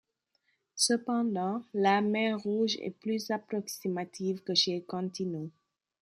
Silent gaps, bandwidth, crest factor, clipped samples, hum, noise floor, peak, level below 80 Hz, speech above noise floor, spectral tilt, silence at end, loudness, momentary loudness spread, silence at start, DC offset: none; 15 kHz; 20 dB; under 0.1%; none; -77 dBFS; -12 dBFS; -80 dBFS; 46 dB; -3.5 dB/octave; 0.5 s; -31 LUFS; 9 LU; 0.75 s; under 0.1%